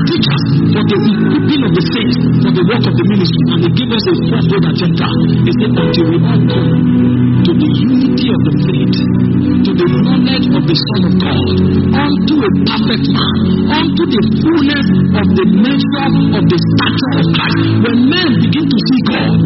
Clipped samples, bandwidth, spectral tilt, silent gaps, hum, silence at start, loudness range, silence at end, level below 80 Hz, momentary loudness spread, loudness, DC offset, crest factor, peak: under 0.1%; 6 kHz; -6 dB/octave; none; none; 0 s; 1 LU; 0 s; -36 dBFS; 2 LU; -11 LUFS; under 0.1%; 10 dB; 0 dBFS